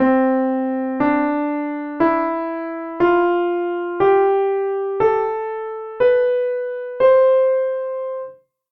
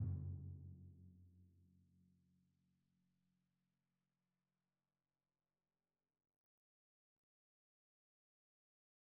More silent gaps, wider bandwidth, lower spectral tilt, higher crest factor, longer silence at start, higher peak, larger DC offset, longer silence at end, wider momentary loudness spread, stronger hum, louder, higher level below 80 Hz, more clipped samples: neither; first, 4.7 kHz vs 1.4 kHz; second, -8.5 dB/octave vs -15 dB/octave; second, 14 dB vs 22 dB; about the same, 0 s vs 0 s; first, -4 dBFS vs -36 dBFS; neither; second, 0.4 s vs 7.4 s; second, 11 LU vs 19 LU; neither; first, -19 LUFS vs -52 LUFS; first, -56 dBFS vs -74 dBFS; neither